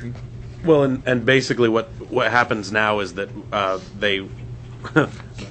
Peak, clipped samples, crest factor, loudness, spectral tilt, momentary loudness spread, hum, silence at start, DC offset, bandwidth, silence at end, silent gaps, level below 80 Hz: -2 dBFS; under 0.1%; 20 dB; -20 LUFS; -5.5 dB/octave; 18 LU; none; 0 s; under 0.1%; 8.6 kHz; 0 s; none; -46 dBFS